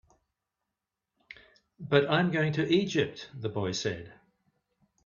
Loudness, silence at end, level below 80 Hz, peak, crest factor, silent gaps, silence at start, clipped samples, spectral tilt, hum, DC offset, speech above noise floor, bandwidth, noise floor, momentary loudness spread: -29 LUFS; 0.95 s; -66 dBFS; -6 dBFS; 26 dB; none; 1.8 s; under 0.1%; -5.5 dB/octave; none; under 0.1%; 59 dB; 7.2 kHz; -87 dBFS; 12 LU